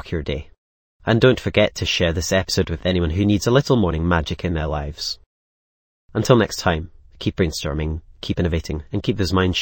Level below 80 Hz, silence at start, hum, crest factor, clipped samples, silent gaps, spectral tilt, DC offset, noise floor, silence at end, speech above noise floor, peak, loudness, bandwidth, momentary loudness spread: -34 dBFS; 0.05 s; none; 20 dB; under 0.1%; 0.58-1.00 s, 5.26-6.09 s; -5.5 dB/octave; under 0.1%; under -90 dBFS; 0 s; over 70 dB; 0 dBFS; -21 LUFS; 17 kHz; 11 LU